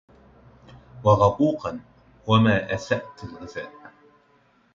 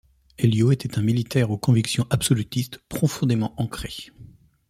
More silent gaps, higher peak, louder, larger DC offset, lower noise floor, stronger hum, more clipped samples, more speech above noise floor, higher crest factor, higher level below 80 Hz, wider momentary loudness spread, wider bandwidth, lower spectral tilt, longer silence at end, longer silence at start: neither; about the same, -4 dBFS vs -6 dBFS; about the same, -22 LUFS vs -23 LUFS; neither; first, -61 dBFS vs -48 dBFS; neither; neither; first, 39 dB vs 26 dB; about the same, 22 dB vs 18 dB; about the same, -50 dBFS vs -48 dBFS; first, 21 LU vs 11 LU; second, 7.4 kHz vs 15.5 kHz; about the same, -7 dB/octave vs -6 dB/octave; first, 1.05 s vs 0.45 s; first, 0.95 s vs 0.4 s